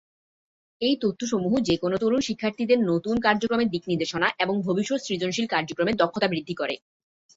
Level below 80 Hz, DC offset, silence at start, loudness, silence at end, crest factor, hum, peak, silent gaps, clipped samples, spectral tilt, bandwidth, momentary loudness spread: -58 dBFS; under 0.1%; 0.8 s; -25 LUFS; 0.6 s; 20 dB; none; -6 dBFS; none; under 0.1%; -5 dB/octave; 8 kHz; 5 LU